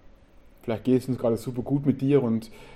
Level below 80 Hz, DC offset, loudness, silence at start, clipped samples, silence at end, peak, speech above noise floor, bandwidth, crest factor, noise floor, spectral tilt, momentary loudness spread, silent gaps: -52 dBFS; under 0.1%; -26 LUFS; 0.65 s; under 0.1%; 0 s; -8 dBFS; 28 dB; 14.5 kHz; 18 dB; -52 dBFS; -8.5 dB/octave; 8 LU; none